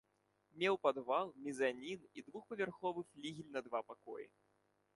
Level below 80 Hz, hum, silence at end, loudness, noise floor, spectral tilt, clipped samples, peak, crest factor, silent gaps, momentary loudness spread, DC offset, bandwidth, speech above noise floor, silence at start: -84 dBFS; none; 0.7 s; -41 LUFS; -80 dBFS; -5 dB/octave; under 0.1%; -20 dBFS; 22 dB; none; 16 LU; under 0.1%; 11.5 kHz; 38 dB; 0.55 s